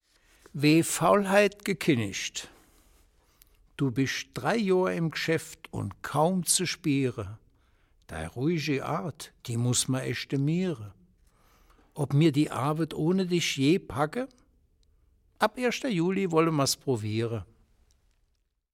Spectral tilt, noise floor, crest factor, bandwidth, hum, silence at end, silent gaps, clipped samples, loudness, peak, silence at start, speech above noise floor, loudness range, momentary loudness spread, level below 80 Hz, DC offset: -5 dB/octave; -73 dBFS; 20 dB; 16.5 kHz; none; 1.3 s; none; under 0.1%; -27 LUFS; -8 dBFS; 0.55 s; 46 dB; 3 LU; 15 LU; -60 dBFS; under 0.1%